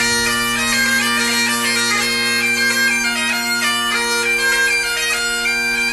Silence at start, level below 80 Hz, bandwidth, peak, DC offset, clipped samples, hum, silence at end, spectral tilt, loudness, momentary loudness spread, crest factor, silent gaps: 0 s; -46 dBFS; 13 kHz; -6 dBFS; under 0.1%; under 0.1%; none; 0 s; -0.5 dB/octave; -15 LUFS; 3 LU; 12 dB; none